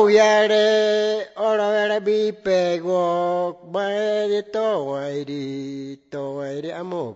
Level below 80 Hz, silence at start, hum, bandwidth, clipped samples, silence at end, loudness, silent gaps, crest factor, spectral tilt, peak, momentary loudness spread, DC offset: -66 dBFS; 0 s; none; 8 kHz; under 0.1%; 0 s; -21 LUFS; none; 16 dB; -4.5 dB/octave; -4 dBFS; 13 LU; under 0.1%